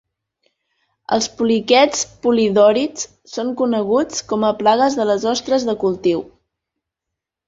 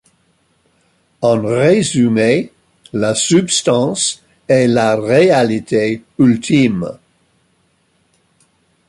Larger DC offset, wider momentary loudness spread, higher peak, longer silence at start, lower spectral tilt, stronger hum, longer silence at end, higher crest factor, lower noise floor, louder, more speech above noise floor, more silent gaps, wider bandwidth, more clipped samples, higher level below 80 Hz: neither; about the same, 10 LU vs 8 LU; about the same, -2 dBFS vs -2 dBFS; about the same, 1.1 s vs 1.2 s; second, -3.5 dB/octave vs -5 dB/octave; neither; second, 1.25 s vs 1.95 s; about the same, 16 dB vs 14 dB; first, -83 dBFS vs -59 dBFS; second, -17 LUFS vs -14 LUFS; first, 66 dB vs 46 dB; neither; second, 8 kHz vs 11.5 kHz; neither; about the same, -56 dBFS vs -52 dBFS